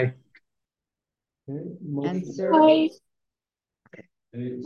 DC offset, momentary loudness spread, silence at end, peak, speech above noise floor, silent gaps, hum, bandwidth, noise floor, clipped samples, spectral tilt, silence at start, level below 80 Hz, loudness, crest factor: under 0.1%; 19 LU; 0 s; -6 dBFS; over 67 dB; none; none; 7 kHz; under -90 dBFS; under 0.1%; -7.5 dB/octave; 0 s; -74 dBFS; -22 LUFS; 20 dB